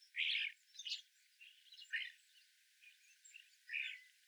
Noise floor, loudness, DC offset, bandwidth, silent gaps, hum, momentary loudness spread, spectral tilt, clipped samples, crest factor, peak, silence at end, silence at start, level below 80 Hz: -71 dBFS; -43 LUFS; under 0.1%; over 20 kHz; none; none; 26 LU; 8.5 dB/octave; under 0.1%; 20 dB; -30 dBFS; 0.2 s; 0 s; under -90 dBFS